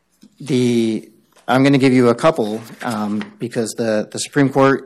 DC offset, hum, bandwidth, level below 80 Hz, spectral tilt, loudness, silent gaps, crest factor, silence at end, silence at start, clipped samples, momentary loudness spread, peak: under 0.1%; none; 13 kHz; -58 dBFS; -6 dB/octave; -17 LUFS; none; 14 dB; 0 s; 0.4 s; under 0.1%; 12 LU; -4 dBFS